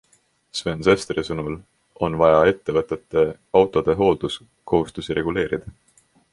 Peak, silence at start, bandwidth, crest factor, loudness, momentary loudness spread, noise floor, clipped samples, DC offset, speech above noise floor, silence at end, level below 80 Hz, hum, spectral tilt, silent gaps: -2 dBFS; 0.55 s; 11.5 kHz; 20 dB; -21 LUFS; 12 LU; -61 dBFS; under 0.1%; under 0.1%; 41 dB; 0.6 s; -46 dBFS; none; -6 dB/octave; none